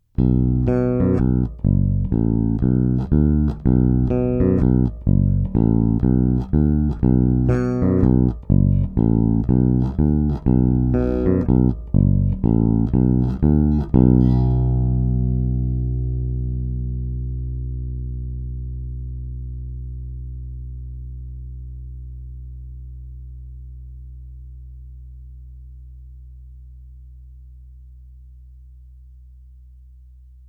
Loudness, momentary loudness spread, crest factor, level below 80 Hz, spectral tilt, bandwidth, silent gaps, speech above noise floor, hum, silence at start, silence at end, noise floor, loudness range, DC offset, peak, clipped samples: -19 LUFS; 20 LU; 18 dB; -26 dBFS; -12.5 dB/octave; 2.8 kHz; none; 27 dB; none; 0.2 s; 1.25 s; -44 dBFS; 20 LU; under 0.1%; -2 dBFS; under 0.1%